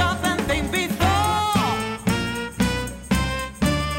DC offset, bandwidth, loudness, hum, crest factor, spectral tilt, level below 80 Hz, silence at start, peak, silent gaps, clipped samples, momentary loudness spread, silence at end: under 0.1%; 16.5 kHz; -22 LUFS; none; 14 dB; -4.5 dB/octave; -34 dBFS; 0 s; -8 dBFS; none; under 0.1%; 4 LU; 0 s